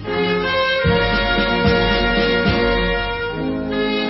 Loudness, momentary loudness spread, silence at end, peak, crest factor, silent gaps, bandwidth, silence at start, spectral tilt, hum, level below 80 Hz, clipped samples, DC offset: -17 LUFS; 6 LU; 0 s; -2 dBFS; 16 dB; none; 5.8 kHz; 0 s; -9 dB/octave; none; -28 dBFS; under 0.1%; under 0.1%